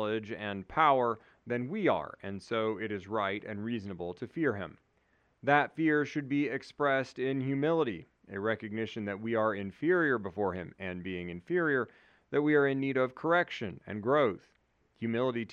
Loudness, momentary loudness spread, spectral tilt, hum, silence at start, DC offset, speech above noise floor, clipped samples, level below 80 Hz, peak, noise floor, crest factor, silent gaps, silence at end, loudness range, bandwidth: -32 LUFS; 12 LU; -7.5 dB/octave; none; 0 s; under 0.1%; 40 dB; under 0.1%; -70 dBFS; -10 dBFS; -72 dBFS; 22 dB; none; 0 s; 3 LU; 9.2 kHz